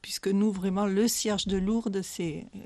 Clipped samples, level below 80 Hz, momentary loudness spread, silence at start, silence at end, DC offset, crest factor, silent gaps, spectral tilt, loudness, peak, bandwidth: under 0.1%; -52 dBFS; 8 LU; 0.05 s; 0 s; under 0.1%; 14 dB; none; -4.5 dB/octave; -28 LUFS; -14 dBFS; 13.5 kHz